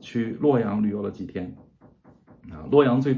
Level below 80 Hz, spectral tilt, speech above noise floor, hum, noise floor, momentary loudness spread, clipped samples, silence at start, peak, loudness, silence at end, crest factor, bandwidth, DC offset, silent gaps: -54 dBFS; -9 dB/octave; 31 dB; none; -54 dBFS; 19 LU; under 0.1%; 0.05 s; -4 dBFS; -23 LUFS; 0 s; 20 dB; 7 kHz; under 0.1%; none